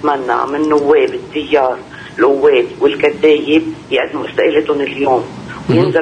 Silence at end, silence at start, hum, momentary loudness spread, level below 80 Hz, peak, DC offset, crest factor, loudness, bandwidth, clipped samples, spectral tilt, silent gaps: 0 s; 0 s; none; 7 LU; -50 dBFS; -2 dBFS; under 0.1%; 12 dB; -14 LUFS; 9.4 kHz; under 0.1%; -6.5 dB/octave; none